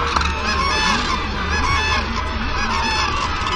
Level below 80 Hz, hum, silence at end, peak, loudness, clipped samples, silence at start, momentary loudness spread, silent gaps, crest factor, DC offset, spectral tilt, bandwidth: -26 dBFS; none; 0 s; -2 dBFS; -19 LUFS; under 0.1%; 0 s; 5 LU; none; 16 dB; under 0.1%; -3.5 dB/octave; 11.5 kHz